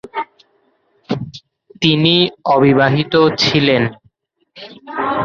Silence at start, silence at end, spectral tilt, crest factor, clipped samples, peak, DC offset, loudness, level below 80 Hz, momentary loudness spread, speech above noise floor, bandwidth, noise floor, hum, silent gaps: 0.05 s; 0 s; -6 dB/octave; 16 dB; under 0.1%; 0 dBFS; under 0.1%; -14 LUFS; -50 dBFS; 17 LU; 45 dB; 7.4 kHz; -59 dBFS; none; none